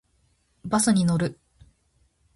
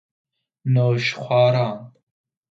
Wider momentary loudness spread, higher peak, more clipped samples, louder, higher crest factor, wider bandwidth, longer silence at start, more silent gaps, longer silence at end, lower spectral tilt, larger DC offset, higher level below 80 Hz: about the same, 12 LU vs 12 LU; second, -10 dBFS vs -6 dBFS; neither; second, -23 LUFS vs -20 LUFS; about the same, 18 dB vs 16 dB; first, 12 kHz vs 7.4 kHz; about the same, 0.65 s vs 0.65 s; neither; first, 1.05 s vs 0.6 s; second, -5 dB/octave vs -7 dB/octave; neither; first, -54 dBFS vs -64 dBFS